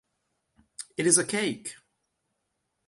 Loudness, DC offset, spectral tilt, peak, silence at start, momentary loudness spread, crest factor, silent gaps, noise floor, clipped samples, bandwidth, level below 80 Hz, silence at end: -24 LUFS; under 0.1%; -2.5 dB/octave; -6 dBFS; 0.8 s; 19 LU; 26 dB; none; -79 dBFS; under 0.1%; 11.5 kHz; -74 dBFS; 1.15 s